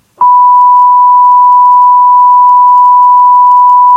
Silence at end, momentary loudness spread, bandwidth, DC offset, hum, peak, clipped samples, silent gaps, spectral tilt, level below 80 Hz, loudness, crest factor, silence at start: 0 s; 0 LU; 2.1 kHz; under 0.1%; none; 0 dBFS; 3%; none; -3 dB/octave; -72 dBFS; -3 LUFS; 4 dB; 0.2 s